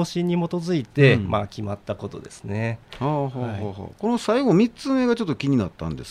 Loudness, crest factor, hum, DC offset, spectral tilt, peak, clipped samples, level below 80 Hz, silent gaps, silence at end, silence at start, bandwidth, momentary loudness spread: -23 LUFS; 18 dB; none; under 0.1%; -7 dB/octave; -4 dBFS; under 0.1%; -52 dBFS; none; 0 s; 0 s; 11.5 kHz; 14 LU